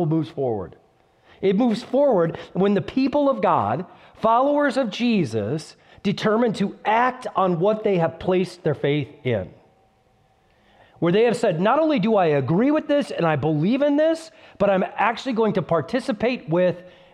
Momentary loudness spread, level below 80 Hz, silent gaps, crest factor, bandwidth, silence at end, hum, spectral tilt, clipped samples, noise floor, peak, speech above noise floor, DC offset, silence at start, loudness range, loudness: 7 LU; -58 dBFS; none; 16 dB; 11.5 kHz; 0.25 s; none; -7 dB/octave; under 0.1%; -60 dBFS; -6 dBFS; 40 dB; under 0.1%; 0 s; 4 LU; -21 LUFS